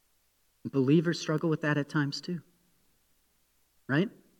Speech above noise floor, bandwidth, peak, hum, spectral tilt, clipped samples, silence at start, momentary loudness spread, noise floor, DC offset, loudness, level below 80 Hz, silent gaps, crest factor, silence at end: 43 dB; 12.5 kHz; -12 dBFS; none; -6.5 dB/octave; under 0.1%; 0.65 s; 14 LU; -71 dBFS; under 0.1%; -30 LUFS; -78 dBFS; none; 18 dB; 0.3 s